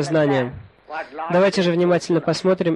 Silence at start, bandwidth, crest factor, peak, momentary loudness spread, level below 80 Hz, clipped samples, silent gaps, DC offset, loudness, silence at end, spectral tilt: 0 s; 11.5 kHz; 14 dB; -6 dBFS; 13 LU; -54 dBFS; under 0.1%; none; under 0.1%; -19 LUFS; 0 s; -6 dB/octave